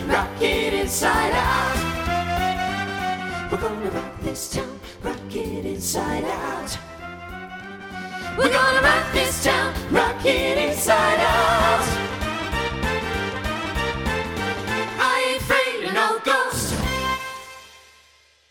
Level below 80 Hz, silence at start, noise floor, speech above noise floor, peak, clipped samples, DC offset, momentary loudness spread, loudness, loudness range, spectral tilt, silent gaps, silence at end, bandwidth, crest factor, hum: -38 dBFS; 0 s; -56 dBFS; 35 dB; -2 dBFS; under 0.1%; under 0.1%; 14 LU; -22 LUFS; 9 LU; -3.5 dB/octave; none; 0.7 s; 19.5 kHz; 20 dB; none